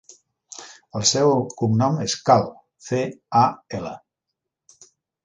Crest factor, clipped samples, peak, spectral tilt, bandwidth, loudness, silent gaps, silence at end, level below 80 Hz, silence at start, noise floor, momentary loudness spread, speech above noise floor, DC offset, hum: 20 dB; under 0.1%; -2 dBFS; -4.5 dB/octave; 10 kHz; -21 LUFS; none; 1.25 s; -60 dBFS; 0.55 s; -82 dBFS; 21 LU; 62 dB; under 0.1%; none